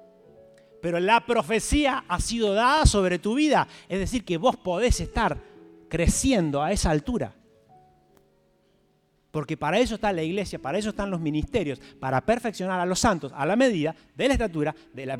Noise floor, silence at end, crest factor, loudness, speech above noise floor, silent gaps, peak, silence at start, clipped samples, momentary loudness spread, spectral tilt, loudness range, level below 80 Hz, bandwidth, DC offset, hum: -66 dBFS; 0 s; 20 dB; -25 LUFS; 42 dB; none; -6 dBFS; 0.85 s; under 0.1%; 9 LU; -4.5 dB/octave; 7 LU; -36 dBFS; 16 kHz; under 0.1%; none